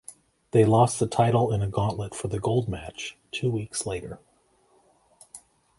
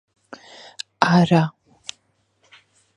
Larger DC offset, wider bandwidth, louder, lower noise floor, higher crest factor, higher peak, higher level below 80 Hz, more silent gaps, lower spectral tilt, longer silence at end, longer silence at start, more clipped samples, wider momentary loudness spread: neither; about the same, 11.5 kHz vs 10.5 kHz; second, -25 LUFS vs -18 LUFS; about the same, -64 dBFS vs -66 dBFS; about the same, 22 dB vs 22 dB; second, -6 dBFS vs 0 dBFS; first, -50 dBFS vs -60 dBFS; neither; about the same, -6 dB/octave vs -6.5 dB/octave; second, 0.4 s vs 1.45 s; second, 0.1 s vs 1 s; neither; about the same, 24 LU vs 25 LU